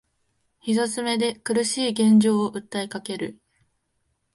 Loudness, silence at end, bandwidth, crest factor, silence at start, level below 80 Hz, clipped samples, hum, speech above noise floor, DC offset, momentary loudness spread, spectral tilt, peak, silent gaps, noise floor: -23 LUFS; 1.05 s; 11.5 kHz; 16 dB; 0.65 s; -68 dBFS; under 0.1%; none; 51 dB; under 0.1%; 14 LU; -4.5 dB/octave; -8 dBFS; none; -73 dBFS